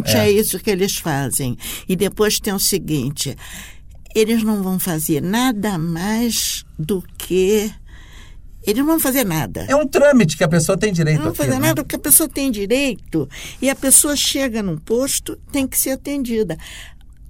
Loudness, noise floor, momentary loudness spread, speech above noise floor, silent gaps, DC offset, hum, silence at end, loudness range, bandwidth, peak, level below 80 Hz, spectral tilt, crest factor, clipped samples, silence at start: -17 LUFS; -38 dBFS; 12 LU; 20 dB; none; under 0.1%; none; 0 s; 5 LU; 16.5 kHz; -2 dBFS; -40 dBFS; -4 dB/octave; 16 dB; under 0.1%; 0 s